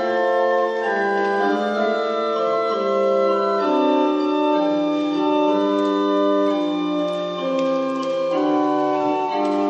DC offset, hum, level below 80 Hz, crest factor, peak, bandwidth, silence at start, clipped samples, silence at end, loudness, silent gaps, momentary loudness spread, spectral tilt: under 0.1%; none; -70 dBFS; 12 dB; -8 dBFS; 8 kHz; 0 s; under 0.1%; 0 s; -20 LUFS; none; 4 LU; -6 dB/octave